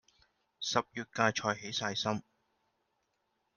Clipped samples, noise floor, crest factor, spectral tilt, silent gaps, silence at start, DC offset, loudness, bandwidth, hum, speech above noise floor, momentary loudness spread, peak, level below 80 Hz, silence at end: under 0.1%; -80 dBFS; 26 dB; -3.5 dB/octave; none; 0.6 s; under 0.1%; -34 LUFS; 10.5 kHz; none; 46 dB; 10 LU; -12 dBFS; -74 dBFS; 1.35 s